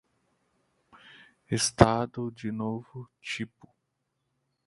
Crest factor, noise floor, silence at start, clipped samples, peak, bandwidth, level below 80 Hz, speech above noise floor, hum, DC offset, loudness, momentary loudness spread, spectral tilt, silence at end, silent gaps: 30 dB; -80 dBFS; 1.5 s; under 0.1%; 0 dBFS; 11.5 kHz; -50 dBFS; 52 dB; none; under 0.1%; -28 LUFS; 18 LU; -4.5 dB/octave; 1.2 s; none